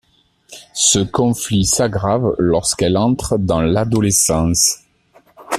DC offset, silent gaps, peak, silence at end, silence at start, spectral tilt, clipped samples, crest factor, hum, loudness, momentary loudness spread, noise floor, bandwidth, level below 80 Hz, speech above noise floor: under 0.1%; none; 0 dBFS; 0 s; 0.5 s; -4 dB/octave; under 0.1%; 16 dB; none; -15 LUFS; 4 LU; -54 dBFS; 14.5 kHz; -38 dBFS; 39 dB